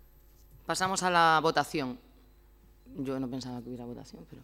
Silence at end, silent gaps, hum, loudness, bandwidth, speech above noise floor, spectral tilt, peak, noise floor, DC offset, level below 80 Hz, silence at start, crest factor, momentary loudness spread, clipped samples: 0 s; none; none; -29 LUFS; 17.5 kHz; 28 dB; -3.5 dB/octave; -12 dBFS; -58 dBFS; under 0.1%; -58 dBFS; 0.55 s; 20 dB; 22 LU; under 0.1%